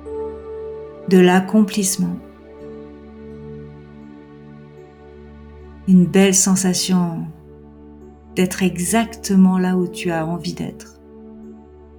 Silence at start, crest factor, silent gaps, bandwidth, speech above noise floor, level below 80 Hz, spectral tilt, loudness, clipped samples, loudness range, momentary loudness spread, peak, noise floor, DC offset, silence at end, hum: 0 s; 18 dB; none; over 20 kHz; 25 dB; -48 dBFS; -5 dB/octave; -17 LUFS; under 0.1%; 15 LU; 26 LU; -2 dBFS; -41 dBFS; under 0.1%; 0.4 s; none